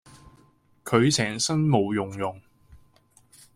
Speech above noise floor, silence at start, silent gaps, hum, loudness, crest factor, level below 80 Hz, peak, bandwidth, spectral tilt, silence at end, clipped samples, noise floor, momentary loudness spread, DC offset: 37 dB; 0.25 s; none; none; -24 LUFS; 20 dB; -58 dBFS; -8 dBFS; 16 kHz; -4.5 dB/octave; 0.8 s; under 0.1%; -60 dBFS; 12 LU; under 0.1%